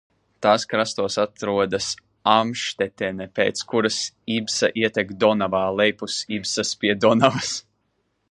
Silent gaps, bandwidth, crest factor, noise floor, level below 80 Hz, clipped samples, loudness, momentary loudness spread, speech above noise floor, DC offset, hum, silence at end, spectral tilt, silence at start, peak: none; 11 kHz; 22 dB; -71 dBFS; -58 dBFS; under 0.1%; -22 LUFS; 7 LU; 49 dB; under 0.1%; none; 0.7 s; -3.5 dB/octave; 0.4 s; 0 dBFS